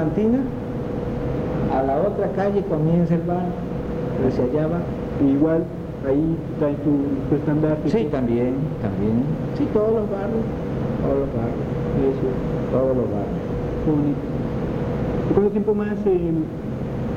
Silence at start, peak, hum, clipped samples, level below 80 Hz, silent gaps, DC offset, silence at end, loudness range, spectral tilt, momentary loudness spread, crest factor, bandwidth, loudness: 0 s; -6 dBFS; none; under 0.1%; -38 dBFS; none; under 0.1%; 0 s; 1 LU; -10 dB/octave; 6 LU; 16 dB; 7.6 kHz; -22 LUFS